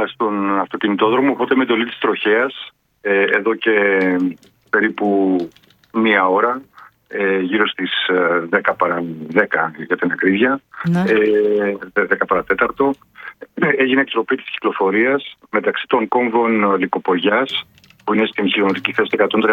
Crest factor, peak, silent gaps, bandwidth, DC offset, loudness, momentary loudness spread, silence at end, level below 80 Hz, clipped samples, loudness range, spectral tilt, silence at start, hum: 16 dB; 0 dBFS; none; 6.8 kHz; under 0.1%; -17 LUFS; 7 LU; 0 s; -60 dBFS; under 0.1%; 1 LU; -7 dB/octave; 0 s; none